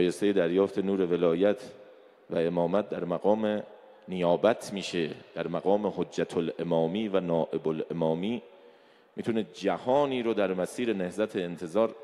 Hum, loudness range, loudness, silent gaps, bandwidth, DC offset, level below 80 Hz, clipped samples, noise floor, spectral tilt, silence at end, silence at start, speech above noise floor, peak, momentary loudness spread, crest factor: none; 2 LU; -29 LUFS; none; 13 kHz; under 0.1%; -68 dBFS; under 0.1%; -58 dBFS; -6.5 dB/octave; 0 s; 0 s; 30 dB; -10 dBFS; 9 LU; 18 dB